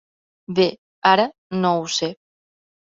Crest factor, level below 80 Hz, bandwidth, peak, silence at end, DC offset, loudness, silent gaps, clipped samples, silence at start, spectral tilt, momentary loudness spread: 20 dB; -64 dBFS; 7.8 kHz; -2 dBFS; 0.75 s; under 0.1%; -20 LUFS; 0.78-1.02 s, 1.38-1.50 s; under 0.1%; 0.5 s; -4.5 dB/octave; 8 LU